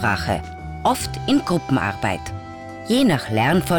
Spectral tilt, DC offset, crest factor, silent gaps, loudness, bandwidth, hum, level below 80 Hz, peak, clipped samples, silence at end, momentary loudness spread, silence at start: -5.5 dB/octave; under 0.1%; 12 dB; none; -21 LUFS; over 20 kHz; none; -42 dBFS; -8 dBFS; under 0.1%; 0 s; 15 LU; 0 s